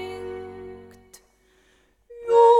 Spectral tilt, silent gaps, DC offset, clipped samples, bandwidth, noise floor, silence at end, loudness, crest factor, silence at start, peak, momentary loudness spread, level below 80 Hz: -4.5 dB/octave; none; under 0.1%; under 0.1%; 10.5 kHz; -62 dBFS; 0 s; -24 LUFS; 16 dB; 0 s; -6 dBFS; 28 LU; -60 dBFS